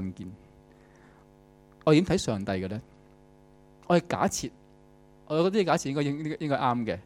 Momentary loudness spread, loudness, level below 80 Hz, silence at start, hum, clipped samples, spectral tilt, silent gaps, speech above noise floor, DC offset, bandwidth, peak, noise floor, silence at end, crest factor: 14 LU; -27 LUFS; -56 dBFS; 0 s; 50 Hz at -55 dBFS; under 0.1%; -5.5 dB/octave; none; 30 dB; under 0.1%; 16 kHz; -8 dBFS; -56 dBFS; 0.05 s; 22 dB